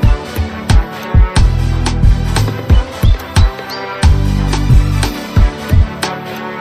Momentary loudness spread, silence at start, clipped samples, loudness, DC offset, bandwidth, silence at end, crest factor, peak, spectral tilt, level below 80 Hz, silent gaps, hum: 8 LU; 0 s; under 0.1%; -14 LUFS; under 0.1%; 15 kHz; 0 s; 12 dB; 0 dBFS; -6 dB/octave; -14 dBFS; none; none